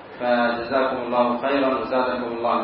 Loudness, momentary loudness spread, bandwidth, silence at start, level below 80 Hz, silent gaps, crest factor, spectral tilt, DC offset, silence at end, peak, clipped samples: -22 LUFS; 2 LU; 5.6 kHz; 0 s; -58 dBFS; none; 16 dB; -9.5 dB/octave; under 0.1%; 0 s; -6 dBFS; under 0.1%